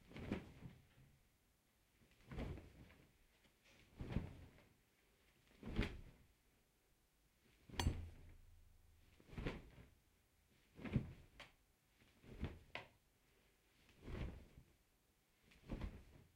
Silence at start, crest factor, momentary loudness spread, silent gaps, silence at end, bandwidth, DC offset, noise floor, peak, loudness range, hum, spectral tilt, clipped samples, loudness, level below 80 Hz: 0 s; 30 dB; 21 LU; none; 0.1 s; 16 kHz; under 0.1%; -79 dBFS; -24 dBFS; 7 LU; none; -6 dB/octave; under 0.1%; -51 LUFS; -58 dBFS